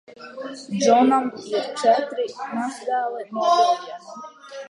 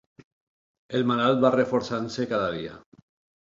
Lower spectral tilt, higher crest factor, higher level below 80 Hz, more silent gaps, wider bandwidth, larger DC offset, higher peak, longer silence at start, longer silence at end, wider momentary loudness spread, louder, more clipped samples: second, -4 dB/octave vs -6.5 dB/octave; about the same, 18 dB vs 22 dB; second, -78 dBFS vs -62 dBFS; neither; first, 11 kHz vs 7.6 kHz; neither; about the same, -4 dBFS vs -6 dBFS; second, 0.2 s vs 0.9 s; second, 0 s vs 0.65 s; first, 20 LU vs 10 LU; first, -21 LUFS vs -25 LUFS; neither